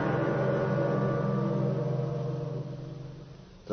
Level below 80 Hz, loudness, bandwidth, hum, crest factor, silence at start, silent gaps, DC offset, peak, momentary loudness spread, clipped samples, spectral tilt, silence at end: -56 dBFS; -30 LUFS; 6.4 kHz; none; 14 dB; 0 s; none; under 0.1%; -16 dBFS; 16 LU; under 0.1%; -9 dB/octave; 0 s